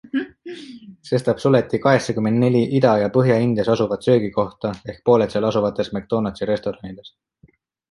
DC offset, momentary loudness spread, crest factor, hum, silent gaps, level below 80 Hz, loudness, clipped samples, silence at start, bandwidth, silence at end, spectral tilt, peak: under 0.1%; 17 LU; 18 dB; none; none; -52 dBFS; -19 LUFS; under 0.1%; 0.15 s; 11.5 kHz; 0.85 s; -7.5 dB/octave; -2 dBFS